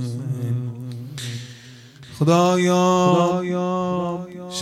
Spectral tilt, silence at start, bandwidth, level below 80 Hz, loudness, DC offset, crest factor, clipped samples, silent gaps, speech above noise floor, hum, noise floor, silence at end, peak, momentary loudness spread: -6 dB/octave; 0 s; 13.5 kHz; -62 dBFS; -21 LUFS; under 0.1%; 16 dB; under 0.1%; none; 24 dB; none; -43 dBFS; 0 s; -6 dBFS; 16 LU